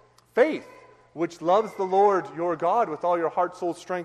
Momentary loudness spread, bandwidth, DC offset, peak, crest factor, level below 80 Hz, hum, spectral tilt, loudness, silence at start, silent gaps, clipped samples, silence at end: 11 LU; 12 kHz; under 0.1%; -8 dBFS; 16 dB; -72 dBFS; none; -6 dB/octave; -25 LUFS; 0.35 s; none; under 0.1%; 0 s